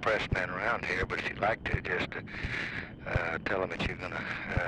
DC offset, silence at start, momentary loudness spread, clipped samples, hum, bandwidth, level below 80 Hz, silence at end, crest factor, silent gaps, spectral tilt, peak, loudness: under 0.1%; 0 s; 6 LU; under 0.1%; none; 11.5 kHz; -46 dBFS; 0 s; 18 dB; none; -6 dB/octave; -14 dBFS; -33 LUFS